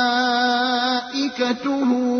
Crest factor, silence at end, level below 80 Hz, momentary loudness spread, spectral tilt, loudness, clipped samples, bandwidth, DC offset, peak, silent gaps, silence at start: 14 dB; 0 s; -64 dBFS; 4 LU; -3 dB/octave; -20 LUFS; under 0.1%; 6.6 kHz; under 0.1%; -6 dBFS; none; 0 s